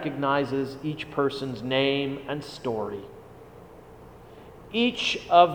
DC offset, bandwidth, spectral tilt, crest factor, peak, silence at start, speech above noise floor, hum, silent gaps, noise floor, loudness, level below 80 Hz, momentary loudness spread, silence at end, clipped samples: under 0.1%; 19 kHz; -5.5 dB/octave; 24 dB; -4 dBFS; 0 s; 22 dB; none; none; -47 dBFS; -27 LUFS; -58 dBFS; 24 LU; 0 s; under 0.1%